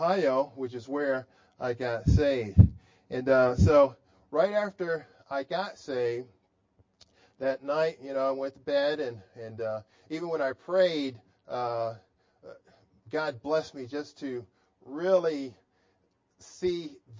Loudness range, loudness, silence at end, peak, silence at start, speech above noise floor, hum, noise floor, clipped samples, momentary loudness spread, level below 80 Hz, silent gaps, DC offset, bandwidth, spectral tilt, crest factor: 9 LU; -29 LUFS; 0 s; -4 dBFS; 0 s; 44 dB; none; -72 dBFS; under 0.1%; 15 LU; -42 dBFS; none; under 0.1%; 7.6 kHz; -7.5 dB/octave; 26 dB